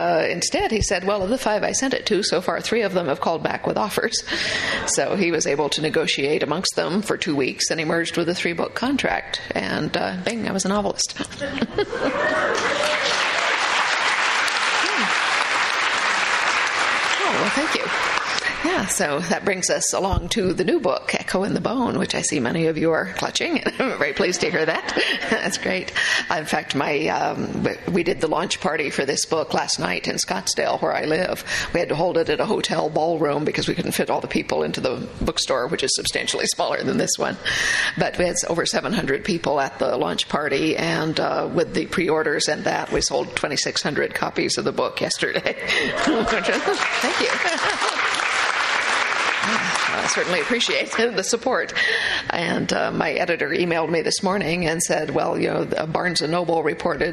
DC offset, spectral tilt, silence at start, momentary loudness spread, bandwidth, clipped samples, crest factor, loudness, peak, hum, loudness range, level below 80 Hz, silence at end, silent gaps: under 0.1%; -3 dB/octave; 0 s; 4 LU; 14 kHz; under 0.1%; 22 dB; -21 LUFS; 0 dBFS; none; 3 LU; -46 dBFS; 0 s; none